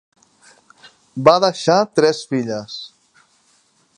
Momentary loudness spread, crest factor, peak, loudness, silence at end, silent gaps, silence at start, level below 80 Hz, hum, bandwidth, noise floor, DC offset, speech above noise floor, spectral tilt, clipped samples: 19 LU; 20 dB; 0 dBFS; -17 LUFS; 1.1 s; none; 1.15 s; -62 dBFS; none; 10.5 kHz; -59 dBFS; under 0.1%; 43 dB; -5 dB/octave; under 0.1%